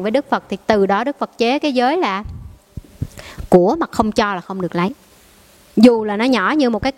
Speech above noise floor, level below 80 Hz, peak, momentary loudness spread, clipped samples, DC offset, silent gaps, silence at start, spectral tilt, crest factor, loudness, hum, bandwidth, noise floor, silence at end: 32 dB; -42 dBFS; 0 dBFS; 18 LU; under 0.1%; under 0.1%; none; 0 s; -6 dB/octave; 18 dB; -17 LUFS; none; 14 kHz; -48 dBFS; 0.05 s